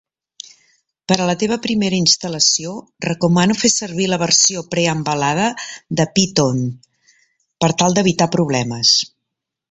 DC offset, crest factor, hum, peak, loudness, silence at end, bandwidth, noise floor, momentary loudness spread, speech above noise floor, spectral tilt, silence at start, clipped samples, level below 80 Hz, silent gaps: under 0.1%; 18 dB; none; 0 dBFS; -16 LUFS; 0.65 s; 8.4 kHz; -80 dBFS; 13 LU; 63 dB; -3.5 dB/octave; 1.1 s; under 0.1%; -52 dBFS; none